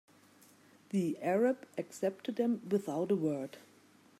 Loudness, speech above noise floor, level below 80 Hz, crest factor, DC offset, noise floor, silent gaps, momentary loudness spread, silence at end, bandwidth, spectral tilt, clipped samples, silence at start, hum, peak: -35 LUFS; 30 dB; -86 dBFS; 16 dB; under 0.1%; -63 dBFS; none; 10 LU; 0.6 s; 15.5 kHz; -7 dB/octave; under 0.1%; 0.95 s; none; -20 dBFS